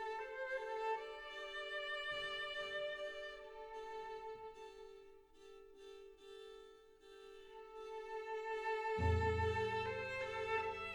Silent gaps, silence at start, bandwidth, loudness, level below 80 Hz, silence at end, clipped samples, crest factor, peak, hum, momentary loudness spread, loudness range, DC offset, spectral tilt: none; 0 s; 19 kHz; -43 LUFS; -58 dBFS; 0 s; under 0.1%; 20 dB; -24 dBFS; none; 21 LU; 16 LU; under 0.1%; -5 dB/octave